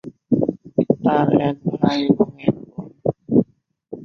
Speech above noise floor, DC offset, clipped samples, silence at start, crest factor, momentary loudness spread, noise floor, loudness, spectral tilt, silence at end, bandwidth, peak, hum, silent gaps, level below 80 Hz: 31 dB; under 0.1%; under 0.1%; 0.05 s; 18 dB; 11 LU; -49 dBFS; -20 LUFS; -8.5 dB/octave; 0 s; 6.8 kHz; -2 dBFS; none; none; -54 dBFS